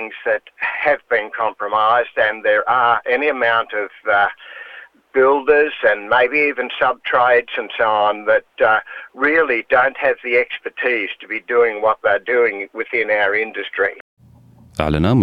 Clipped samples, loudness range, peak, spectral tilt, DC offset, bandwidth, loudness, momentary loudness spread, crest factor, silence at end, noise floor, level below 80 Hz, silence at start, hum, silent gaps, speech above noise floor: under 0.1%; 2 LU; -2 dBFS; -7 dB/octave; under 0.1%; 5.6 kHz; -17 LUFS; 9 LU; 16 dB; 0 s; -47 dBFS; -46 dBFS; 0 s; none; 14.01-14.17 s; 30 dB